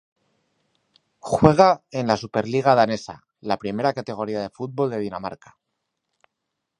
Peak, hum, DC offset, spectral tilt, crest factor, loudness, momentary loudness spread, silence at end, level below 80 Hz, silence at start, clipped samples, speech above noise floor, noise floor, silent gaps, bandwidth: 0 dBFS; none; under 0.1%; -6.5 dB/octave; 24 dB; -22 LUFS; 15 LU; 1.45 s; -54 dBFS; 1.25 s; under 0.1%; 59 dB; -80 dBFS; none; 11 kHz